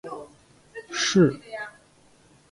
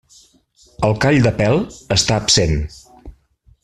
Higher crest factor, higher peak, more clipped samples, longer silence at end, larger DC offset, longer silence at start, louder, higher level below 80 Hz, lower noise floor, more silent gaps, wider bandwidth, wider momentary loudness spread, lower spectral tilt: about the same, 20 dB vs 16 dB; second, -8 dBFS vs -2 dBFS; neither; first, 0.8 s vs 0.5 s; neither; second, 0.05 s vs 0.8 s; second, -23 LUFS vs -16 LUFS; second, -66 dBFS vs -34 dBFS; about the same, -57 dBFS vs -54 dBFS; neither; second, 11.5 kHz vs 13 kHz; first, 23 LU vs 7 LU; about the same, -4.5 dB/octave vs -4 dB/octave